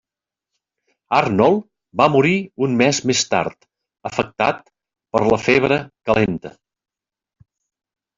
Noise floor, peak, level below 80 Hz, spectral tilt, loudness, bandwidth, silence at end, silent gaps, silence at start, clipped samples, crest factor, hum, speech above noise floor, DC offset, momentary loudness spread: -87 dBFS; -2 dBFS; -52 dBFS; -4.5 dB/octave; -18 LUFS; 7.8 kHz; 1.7 s; none; 1.1 s; under 0.1%; 18 dB; none; 70 dB; under 0.1%; 13 LU